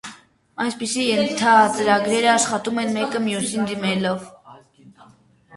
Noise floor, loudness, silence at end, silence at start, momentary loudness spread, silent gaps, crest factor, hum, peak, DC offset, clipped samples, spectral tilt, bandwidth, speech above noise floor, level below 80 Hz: -52 dBFS; -20 LUFS; 0 s; 0.05 s; 11 LU; none; 18 dB; none; -2 dBFS; under 0.1%; under 0.1%; -3.5 dB/octave; 11.5 kHz; 33 dB; -62 dBFS